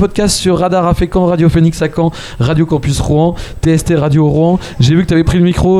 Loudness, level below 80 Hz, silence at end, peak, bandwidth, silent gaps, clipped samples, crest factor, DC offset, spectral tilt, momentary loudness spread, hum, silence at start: -12 LUFS; -24 dBFS; 0 s; 0 dBFS; 13 kHz; none; under 0.1%; 10 dB; under 0.1%; -6.5 dB/octave; 4 LU; none; 0 s